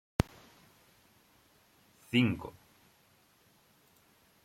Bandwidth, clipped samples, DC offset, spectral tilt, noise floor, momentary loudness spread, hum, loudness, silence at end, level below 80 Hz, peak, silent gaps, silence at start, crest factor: 16 kHz; under 0.1%; under 0.1%; -6 dB/octave; -67 dBFS; 20 LU; none; -32 LUFS; 1.95 s; -54 dBFS; -10 dBFS; none; 0.2 s; 30 dB